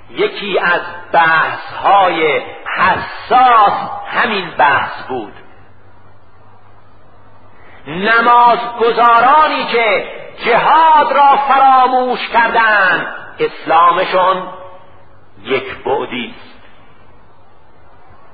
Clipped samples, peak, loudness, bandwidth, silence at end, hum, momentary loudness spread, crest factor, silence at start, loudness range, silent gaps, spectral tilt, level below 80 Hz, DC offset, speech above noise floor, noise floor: under 0.1%; 0 dBFS; -12 LUFS; 5 kHz; 2 s; none; 13 LU; 14 dB; 0.1 s; 12 LU; none; -7.5 dB/octave; -52 dBFS; 2%; 34 dB; -46 dBFS